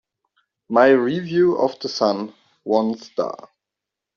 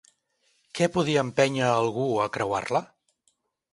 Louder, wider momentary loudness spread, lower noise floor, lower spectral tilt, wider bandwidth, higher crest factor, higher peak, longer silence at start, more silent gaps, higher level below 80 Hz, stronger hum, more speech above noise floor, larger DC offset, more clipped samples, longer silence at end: first, -20 LUFS vs -25 LUFS; first, 14 LU vs 6 LU; first, -85 dBFS vs -72 dBFS; about the same, -4.5 dB/octave vs -5 dB/octave; second, 7 kHz vs 11.5 kHz; about the same, 18 dB vs 20 dB; about the same, -4 dBFS vs -6 dBFS; about the same, 0.7 s vs 0.75 s; neither; about the same, -66 dBFS vs -62 dBFS; neither; first, 66 dB vs 47 dB; neither; neither; about the same, 0.8 s vs 0.85 s